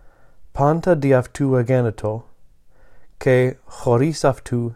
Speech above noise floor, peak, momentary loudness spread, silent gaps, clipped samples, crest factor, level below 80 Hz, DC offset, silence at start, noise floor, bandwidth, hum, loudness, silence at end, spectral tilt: 29 dB; -4 dBFS; 10 LU; none; under 0.1%; 16 dB; -46 dBFS; under 0.1%; 0.05 s; -47 dBFS; 12.5 kHz; none; -19 LUFS; 0 s; -7.5 dB/octave